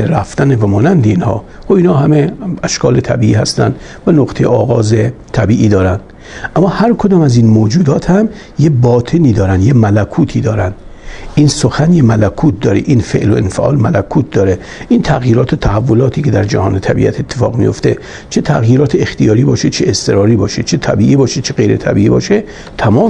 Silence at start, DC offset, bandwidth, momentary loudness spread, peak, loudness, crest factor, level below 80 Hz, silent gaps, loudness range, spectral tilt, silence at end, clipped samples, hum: 0 s; under 0.1%; 10.5 kHz; 6 LU; 0 dBFS; -11 LUFS; 10 dB; -32 dBFS; none; 2 LU; -7 dB/octave; 0 s; 0.1%; none